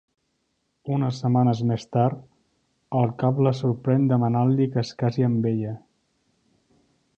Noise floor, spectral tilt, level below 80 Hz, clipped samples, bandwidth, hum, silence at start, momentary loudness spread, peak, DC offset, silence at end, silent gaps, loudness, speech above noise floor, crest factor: -73 dBFS; -9 dB/octave; -62 dBFS; under 0.1%; 7.2 kHz; none; 0.85 s; 8 LU; -8 dBFS; under 0.1%; 1.4 s; none; -23 LUFS; 51 dB; 16 dB